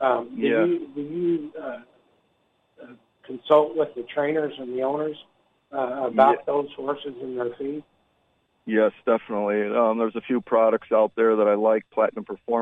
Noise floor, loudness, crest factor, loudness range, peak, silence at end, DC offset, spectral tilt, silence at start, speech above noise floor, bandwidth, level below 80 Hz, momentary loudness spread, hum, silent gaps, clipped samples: -68 dBFS; -23 LUFS; 20 dB; 5 LU; -4 dBFS; 0 s; under 0.1%; -8 dB/octave; 0 s; 45 dB; 4.1 kHz; -72 dBFS; 15 LU; none; none; under 0.1%